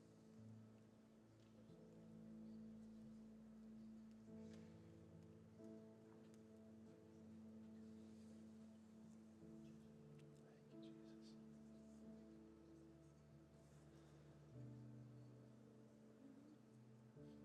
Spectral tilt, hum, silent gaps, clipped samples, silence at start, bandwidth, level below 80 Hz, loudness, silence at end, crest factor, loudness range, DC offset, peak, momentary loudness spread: -7.5 dB/octave; none; none; under 0.1%; 0 s; 9.6 kHz; -84 dBFS; -64 LUFS; 0 s; 14 dB; 3 LU; under 0.1%; -48 dBFS; 7 LU